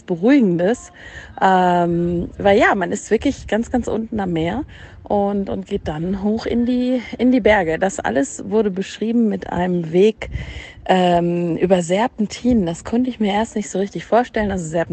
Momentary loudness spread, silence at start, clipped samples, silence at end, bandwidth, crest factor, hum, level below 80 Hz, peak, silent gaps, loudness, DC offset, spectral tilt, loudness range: 9 LU; 0.1 s; under 0.1%; 0 s; 9 kHz; 16 dB; none; -40 dBFS; -2 dBFS; none; -18 LUFS; under 0.1%; -6 dB/octave; 4 LU